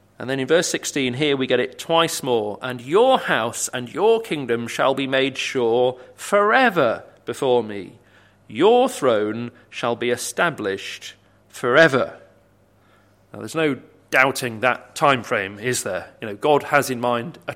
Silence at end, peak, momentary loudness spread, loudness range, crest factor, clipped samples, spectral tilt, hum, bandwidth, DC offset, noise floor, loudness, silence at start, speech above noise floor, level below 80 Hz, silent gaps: 0 s; 0 dBFS; 13 LU; 3 LU; 22 dB; under 0.1%; -3.5 dB/octave; none; 16.5 kHz; under 0.1%; -57 dBFS; -20 LUFS; 0.2 s; 36 dB; -64 dBFS; none